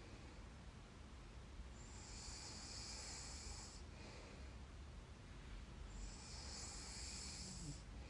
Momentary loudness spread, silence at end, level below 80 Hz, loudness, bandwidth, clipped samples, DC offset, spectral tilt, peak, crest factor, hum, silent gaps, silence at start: 9 LU; 0 s; -58 dBFS; -54 LUFS; 11.5 kHz; under 0.1%; under 0.1%; -3 dB/octave; -40 dBFS; 14 dB; none; none; 0 s